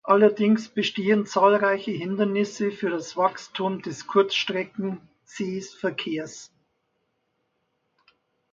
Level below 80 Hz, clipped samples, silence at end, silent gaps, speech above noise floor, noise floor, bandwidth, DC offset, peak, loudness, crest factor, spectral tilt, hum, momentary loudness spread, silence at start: -72 dBFS; under 0.1%; 2.05 s; none; 51 dB; -74 dBFS; 7.8 kHz; under 0.1%; -6 dBFS; -24 LUFS; 20 dB; -5 dB/octave; none; 13 LU; 0.05 s